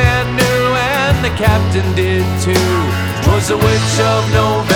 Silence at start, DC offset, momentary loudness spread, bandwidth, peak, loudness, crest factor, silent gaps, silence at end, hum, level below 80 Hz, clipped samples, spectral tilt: 0 s; under 0.1%; 2 LU; 20 kHz; 0 dBFS; -13 LUFS; 12 dB; none; 0 s; none; -28 dBFS; under 0.1%; -5 dB/octave